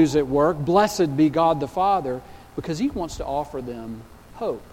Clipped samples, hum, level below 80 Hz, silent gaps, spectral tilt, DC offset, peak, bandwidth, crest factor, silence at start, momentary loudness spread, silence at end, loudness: under 0.1%; none; -46 dBFS; none; -6 dB/octave; under 0.1%; -4 dBFS; 16.5 kHz; 18 dB; 0 s; 15 LU; 0 s; -22 LUFS